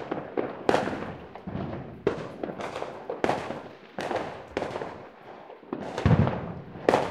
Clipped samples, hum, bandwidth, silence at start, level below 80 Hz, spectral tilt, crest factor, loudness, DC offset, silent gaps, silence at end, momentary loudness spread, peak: under 0.1%; none; 13 kHz; 0 s; -50 dBFS; -7 dB/octave; 26 dB; -30 LUFS; under 0.1%; none; 0 s; 15 LU; -4 dBFS